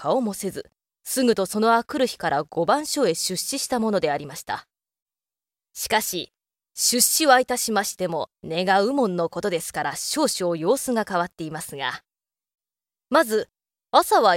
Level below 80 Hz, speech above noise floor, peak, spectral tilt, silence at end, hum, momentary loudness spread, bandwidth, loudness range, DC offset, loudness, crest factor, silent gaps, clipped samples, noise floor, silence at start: -62 dBFS; over 68 dB; -2 dBFS; -2.5 dB/octave; 0 s; none; 14 LU; 16.5 kHz; 5 LU; under 0.1%; -23 LUFS; 22 dB; 5.02-5.06 s; under 0.1%; under -90 dBFS; 0 s